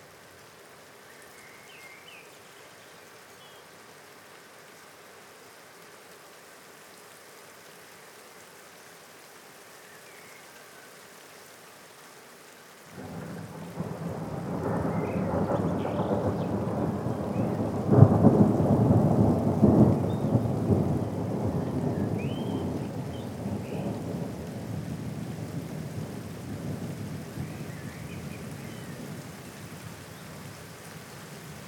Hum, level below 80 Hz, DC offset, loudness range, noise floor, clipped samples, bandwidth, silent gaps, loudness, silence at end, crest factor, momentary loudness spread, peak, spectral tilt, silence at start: none; -56 dBFS; under 0.1%; 25 LU; -51 dBFS; under 0.1%; 18.5 kHz; none; -28 LUFS; 0 s; 28 dB; 26 LU; 0 dBFS; -8 dB/octave; 0 s